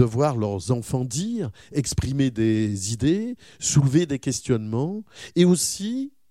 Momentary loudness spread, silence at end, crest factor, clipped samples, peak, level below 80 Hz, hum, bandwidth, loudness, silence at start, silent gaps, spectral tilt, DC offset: 10 LU; 0.2 s; 20 dB; under 0.1%; -4 dBFS; -44 dBFS; none; 15 kHz; -24 LUFS; 0 s; none; -5.5 dB/octave; 0.1%